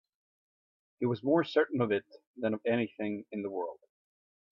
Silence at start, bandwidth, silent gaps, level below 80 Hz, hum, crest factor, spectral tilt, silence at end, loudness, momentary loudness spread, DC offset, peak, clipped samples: 1 s; 6.8 kHz; 2.27-2.34 s; -78 dBFS; none; 20 dB; -8.5 dB/octave; 0.8 s; -32 LUFS; 10 LU; under 0.1%; -14 dBFS; under 0.1%